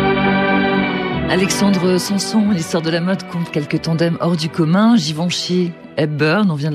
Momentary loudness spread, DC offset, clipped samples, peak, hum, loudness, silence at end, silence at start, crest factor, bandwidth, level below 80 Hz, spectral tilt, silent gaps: 6 LU; under 0.1%; under 0.1%; -2 dBFS; none; -16 LUFS; 0 s; 0 s; 14 dB; 14 kHz; -44 dBFS; -5.5 dB/octave; none